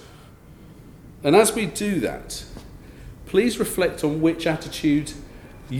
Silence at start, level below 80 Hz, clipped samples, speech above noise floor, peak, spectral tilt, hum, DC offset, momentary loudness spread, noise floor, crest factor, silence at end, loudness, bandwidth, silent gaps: 0 s; -46 dBFS; under 0.1%; 24 dB; -2 dBFS; -4.5 dB/octave; none; under 0.1%; 25 LU; -46 dBFS; 22 dB; 0 s; -22 LUFS; 18.5 kHz; none